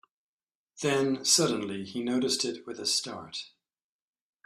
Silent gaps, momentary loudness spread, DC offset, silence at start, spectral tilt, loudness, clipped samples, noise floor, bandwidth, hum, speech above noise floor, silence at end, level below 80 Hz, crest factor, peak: none; 15 LU; under 0.1%; 0.75 s; -2.5 dB/octave; -28 LUFS; under 0.1%; under -90 dBFS; 14.5 kHz; none; over 61 dB; 1 s; -72 dBFS; 22 dB; -10 dBFS